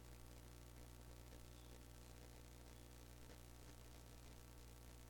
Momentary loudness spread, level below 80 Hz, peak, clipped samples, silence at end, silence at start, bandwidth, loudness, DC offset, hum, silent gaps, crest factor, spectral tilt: 1 LU; -64 dBFS; -42 dBFS; under 0.1%; 0 s; 0 s; 17.5 kHz; -62 LUFS; under 0.1%; 60 Hz at -60 dBFS; none; 18 dB; -4.5 dB/octave